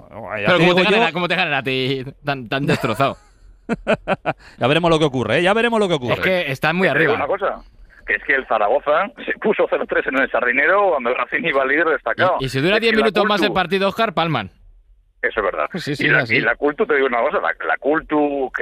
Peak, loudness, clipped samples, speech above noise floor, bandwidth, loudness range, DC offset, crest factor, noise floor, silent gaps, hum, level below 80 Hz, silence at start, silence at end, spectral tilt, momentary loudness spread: -4 dBFS; -18 LUFS; under 0.1%; 33 dB; 15 kHz; 3 LU; under 0.1%; 14 dB; -51 dBFS; none; none; -48 dBFS; 0.15 s; 0 s; -5.5 dB/octave; 8 LU